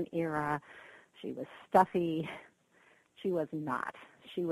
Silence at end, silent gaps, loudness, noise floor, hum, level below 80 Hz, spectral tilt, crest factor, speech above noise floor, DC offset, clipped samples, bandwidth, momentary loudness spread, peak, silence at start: 0 s; none; -34 LUFS; -66 dBFS; none; -72 dBFS; -7 dB/octave; 24 dB; 33 dB; under 0.1%; under 0.1%; 13 kHz; 23 LU; -12 dBFS; 0 s